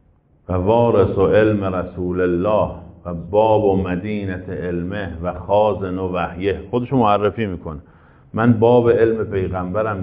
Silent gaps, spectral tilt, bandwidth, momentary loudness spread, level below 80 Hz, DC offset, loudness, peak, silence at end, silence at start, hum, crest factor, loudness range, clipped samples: none; -7 dB/octave; 5 kHz; 12 LU; -42 dBFS; under 0.1%; -18 LUFS; -2 dBFS; 0 s; 0.5 s; none; 16 dB; 3 LU; under 0.1%